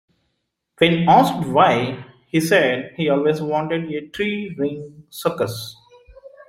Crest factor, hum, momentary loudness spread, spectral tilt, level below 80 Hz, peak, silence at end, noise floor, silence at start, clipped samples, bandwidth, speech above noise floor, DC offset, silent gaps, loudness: 18 dB; none; 14 LU; -5.5 dB/octave; -56 dBFS; -2 dBFS; 0.05 s; -74 dBFS; 0.8 s; under 0.1%; 16 kHz; 56 dB; under 0.1%; none; -19 LUFS